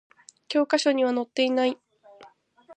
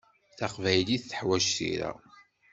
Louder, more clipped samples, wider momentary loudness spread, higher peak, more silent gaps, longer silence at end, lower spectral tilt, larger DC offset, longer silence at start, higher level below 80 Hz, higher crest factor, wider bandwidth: first, -24 LUFS vs -29 LUFS; neither; second, 6 LU vs 11 LU; about the same, -10 dBFS vs -8 dBFS; neither; second, 0.05 s vs 0.3 s; about the same, -2.5 dB/octave vs -3.5 dB/octave; neither; first, 0.5 s vs 0.35 s; second, -84 dBFS vs -62 dBFS; second, 16 dB vs 22 dB; first, 9.4 kHz vs 8.2 kHz